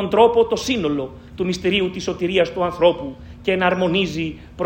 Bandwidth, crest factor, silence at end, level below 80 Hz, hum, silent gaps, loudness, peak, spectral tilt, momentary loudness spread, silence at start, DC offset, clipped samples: 16 kHz; 18 dB; 0 s; -46 dBFS; none; none; -20 LUFS; 0 dBFS; -5 dB/octave; 12 LU; 0 s; under 0.1%; under 0.1%